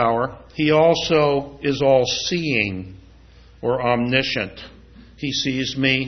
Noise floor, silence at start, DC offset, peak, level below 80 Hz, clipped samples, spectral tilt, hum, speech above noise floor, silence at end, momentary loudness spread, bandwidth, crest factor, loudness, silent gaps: -47 dBFS; 0 s; under 0.1%; -2 dBFS; -48 dBFS; under 0.1%; -4.5 dB/octave; none; 27 dB; 0 s; 12 LU; 6.4 kHz; 18 dB; -20 LUFS; none